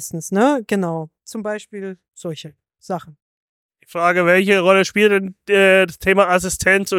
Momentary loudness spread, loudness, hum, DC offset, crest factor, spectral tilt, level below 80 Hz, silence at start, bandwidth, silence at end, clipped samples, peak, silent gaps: 17 LU; -16 LUFS; none; under 0.1%; 16 dB; -4.5 dB/octave; -50 dBFS; 0 s; 16.5 kHz; 0 s; under 0.1%; 0 dBFS; 3.22-3.69 s